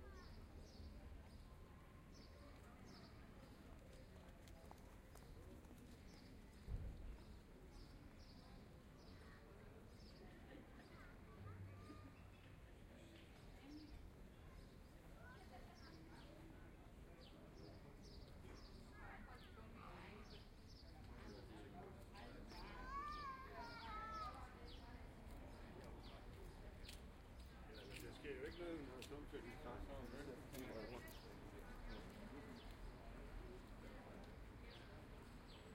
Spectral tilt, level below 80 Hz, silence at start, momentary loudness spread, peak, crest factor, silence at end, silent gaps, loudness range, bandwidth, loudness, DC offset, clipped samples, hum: -5.5 dB/octave; -62 dBFS; 0 s; 10 LU; -36 dBFS; 22 dB; 0 s; none; 8 LU; 16 kHz; -59 LUFS; under 0.1%; under 0.1%; none